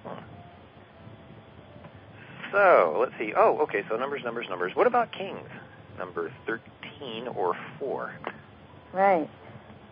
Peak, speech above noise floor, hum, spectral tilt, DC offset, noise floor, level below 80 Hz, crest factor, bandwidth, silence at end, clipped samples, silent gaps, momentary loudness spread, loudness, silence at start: -8 dBFS; 24 dB; none; -9 dB/octave; under 0.1%; -50 dBFS; -64 dBFS; 20 dB; 5.2 kHz; 0.05 s; under 0.1%; none; 25 LU; -27 LUFS; 0.05 s